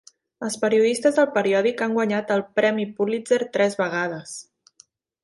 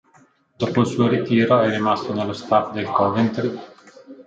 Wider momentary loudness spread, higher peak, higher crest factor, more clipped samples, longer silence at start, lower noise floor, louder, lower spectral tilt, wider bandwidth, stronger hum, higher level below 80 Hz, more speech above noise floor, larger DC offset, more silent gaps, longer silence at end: about the same, 11 LU vs 9 LU; about the same, -6 dBFS vs -4 dBFS; about the same, 16 dB vs 18 dB; neither; second, 0.4 s vs 0.6 s; about the same, -57 dBFS vs -56 dBFS; about the same, -22 LUFS vs -20 LUFS; second, -4.5 dB/octave vs -7 dB/octave; first, 11.5 kHz vs 8 kHz; neither; second, -70 dBFS vs -64 dBFS; about the same, 36 dB vs 36 dB; neither; neither; first, 0.8 s vs 0.05 s